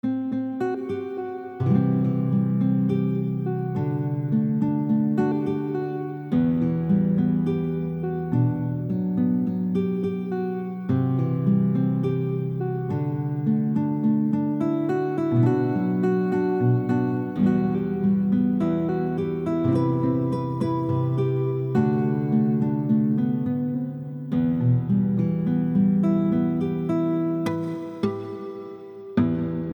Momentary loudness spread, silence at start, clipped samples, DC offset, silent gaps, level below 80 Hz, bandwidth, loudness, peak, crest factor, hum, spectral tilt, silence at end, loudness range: 6 LU; 0.05 s; under 0.1%; under 0.1%; none; -56 dBFS; 18.5 kHz; -24 LUFS; -8 dBFS; 14 dB; none; -10.5 dB/octave; 0 s; 2 LU